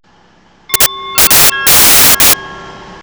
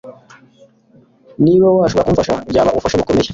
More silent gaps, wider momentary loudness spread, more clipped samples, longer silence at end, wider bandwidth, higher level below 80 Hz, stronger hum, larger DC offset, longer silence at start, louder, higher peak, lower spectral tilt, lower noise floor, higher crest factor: neither; about the same, 7 LU vs 5 LU; neither; about the same, 0.1 s vs 0 s; first, over 20 kHz vs 7.8 kHz; about the same, -34 dBFS vs -38 dBFS; neither; neither; first, 0.7 s vs 0.05 s; first, -5 LUFS vs -14 LUFS; about the same, 0 dBFS vs -2 dBFS; second, 0 dB/octave vs -6.5 dB/octave; second, -46 dBFS vs -50 dBFS; about the same, 10 dB vs 14 dB